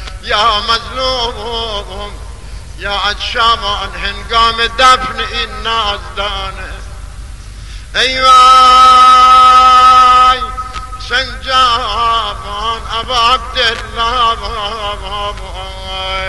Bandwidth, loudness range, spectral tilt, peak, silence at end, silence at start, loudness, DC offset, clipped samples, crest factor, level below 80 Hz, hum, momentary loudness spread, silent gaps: 12 kHz; 10 LU; -2 dB/octave; 0 dBFS; 0 s; 0 s; -9 LUFS; 1%; under 0.1%; 12 dB; -28 dBFS; none; 21 LU; none